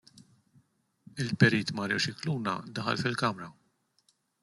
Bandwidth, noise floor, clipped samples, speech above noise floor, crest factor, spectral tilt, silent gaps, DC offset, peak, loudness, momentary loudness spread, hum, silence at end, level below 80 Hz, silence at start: 12 kHz; -72 dBFS; under 0.1%; 42 dB; 24 dB; -5 dB/octave; none; under 0.1%; -8 dBFS; -29 LUFS; 15 LU; none; 0.9 s; -68 dBFS; 1.15 s